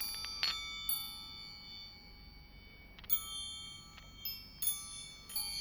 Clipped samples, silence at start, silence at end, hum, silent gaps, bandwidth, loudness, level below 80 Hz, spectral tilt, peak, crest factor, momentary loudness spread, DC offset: under 0.1%; 0 s; 0 s; none; none; over 20 kHz; -38 LUFS; -60 dBFS; 0 dB/octave; -14 dBFS; 28 dB; 21 LU; under 0.1%